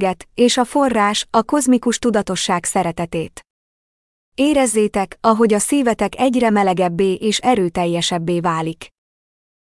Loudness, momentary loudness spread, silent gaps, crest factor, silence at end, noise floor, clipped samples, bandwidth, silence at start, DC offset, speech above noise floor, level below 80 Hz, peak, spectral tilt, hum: -17 LUFS; 7 LU; 3.50-4.32 s; 14 dB; 0.8 s; under -90 dBFS; under 0.1%; 12 kHz; 0 s; under 0.1%; over 73 dB; -48 dBFS; -4 dBFS; -4 dB/octave; none